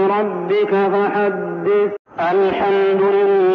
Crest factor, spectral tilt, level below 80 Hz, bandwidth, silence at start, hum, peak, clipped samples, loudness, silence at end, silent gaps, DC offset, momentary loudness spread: 8 dB; -4.5 dB/octave; -58 dBFS; 5 kHz; 0 s; none; -8 dBFS; under 0.1%; -17 LUFS; 0 s; 1.99-2.05 s; under 0.1%; 5 LU